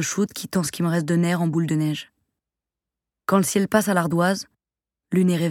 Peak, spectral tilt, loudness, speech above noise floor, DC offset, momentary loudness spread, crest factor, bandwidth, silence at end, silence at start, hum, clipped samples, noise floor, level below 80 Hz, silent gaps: -2 dBFS; -5.5 dB/octave; -22 LUFS; 68 dB; under 0.1%; 7 LU; 20 dB; 16.5 kHz; 0 s; 0 s; none; under 0.1%; -89 dBFS; -62 dBFS; none